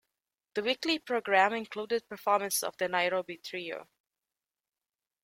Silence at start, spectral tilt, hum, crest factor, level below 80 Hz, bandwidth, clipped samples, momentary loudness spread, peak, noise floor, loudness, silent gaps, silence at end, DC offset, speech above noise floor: 0.55 s; -2 dB/octave; none; 22 dB; -78 dBFS; 16.5 kHz; under 0.1%; 13 LU; -10 dBFS; under -90 dBFS; -31 LUFS; none; 1.4 s; under 0.1%; over 59 dB